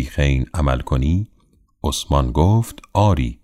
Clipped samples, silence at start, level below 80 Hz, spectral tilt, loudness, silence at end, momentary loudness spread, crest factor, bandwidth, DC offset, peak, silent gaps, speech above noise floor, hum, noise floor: under 0.1%; 0 s; -24 dBFS; -6.5 dB/octave; -19 LUFS; 0.1 s; 7 LU; 16 dB; 16 kHz; under 0.1%; -2 dBFS; none; 39 dB; none; -57 dBFS